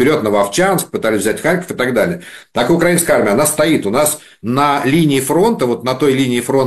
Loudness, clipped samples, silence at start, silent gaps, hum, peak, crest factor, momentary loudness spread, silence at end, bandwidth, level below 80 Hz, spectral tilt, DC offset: -14 LUFS; under 0.1%; 0 s; none; none; 0 dBFS; 14 dB; 5 LU; 0 s; 14.5 kHz; -46 dBFS; -4.5 dB/octave; 0.3%